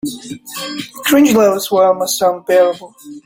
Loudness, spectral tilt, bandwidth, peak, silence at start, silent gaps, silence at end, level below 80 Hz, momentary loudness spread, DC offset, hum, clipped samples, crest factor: -13 LUFS; -3.5 dB/octave; 17 kHz; 0 dBFS; 0.05 s; none; 0.05 s; -56 dBFS; 17 LU; under 0.1%; none; under 0.1%; 14 dB